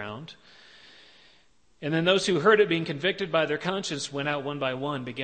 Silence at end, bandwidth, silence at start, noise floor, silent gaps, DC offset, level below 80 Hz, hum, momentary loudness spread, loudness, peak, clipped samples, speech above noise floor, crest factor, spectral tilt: 0 s; 8.8 kHz; 0 s; -64 dBFS; none; under 0.1%; -68 dBFS; none; 13 LU; -26 LUFS; -8 dBFS; under 0.1%; 37 dB; 20 dB; -4.5 dB/octave